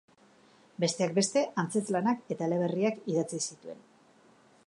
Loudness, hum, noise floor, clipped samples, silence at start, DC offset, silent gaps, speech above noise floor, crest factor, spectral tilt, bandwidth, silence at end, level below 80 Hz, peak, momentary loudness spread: -30 LUFS; none; -61 dBFS; under 0.1%; 0.8 s; under 0.1%; none; 31 dB; 18 dB; -4.5 dB/octave; 11.5 kHz; 0.9 s; -82 dBFS; -14 dBFS; 16 LU